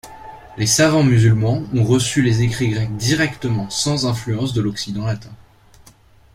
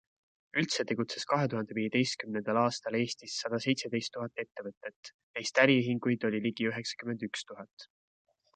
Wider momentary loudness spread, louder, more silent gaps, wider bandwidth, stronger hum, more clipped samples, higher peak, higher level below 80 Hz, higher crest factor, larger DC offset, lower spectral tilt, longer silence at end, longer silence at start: second, 11 LU vs 15 LU; first, -18 LUFS vs -32 LUFS; second, none vs 4.77-4.81 s, 4.96-5.03 s, 5.14-5.34 s, 7.73-7.77 s; first, 15.5 kHz vs 9.4 kHz; neither; neither; first, -2 dBFS vs -8 dBFS; first, -44 dBFS vs -78 dBFS; second, 16 dB vs 24 dB; neither; about the same, -5 dB/octave vs -4.5 dB/octave; first, 1 s vs 0.7 s; second, 0.05 s vs 0.55 s